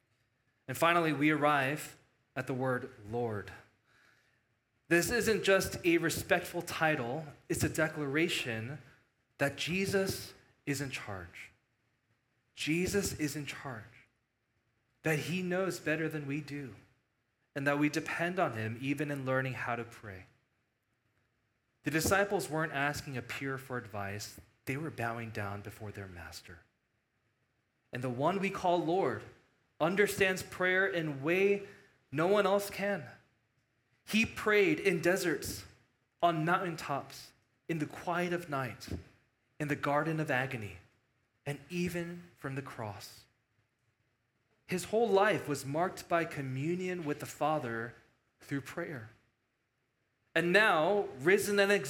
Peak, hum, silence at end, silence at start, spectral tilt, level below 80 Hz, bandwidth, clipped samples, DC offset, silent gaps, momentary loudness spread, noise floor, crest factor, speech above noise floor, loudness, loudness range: -10 dBFS; none; 0 s; 0.7 s; -5 dB/octave; -64 dBFS; 17.5 kHz; under 0.1%; under 0.1%; none; 17 LU; -80 dBFS; 24 dB; 47 dB; -33 LUFS; 8 LU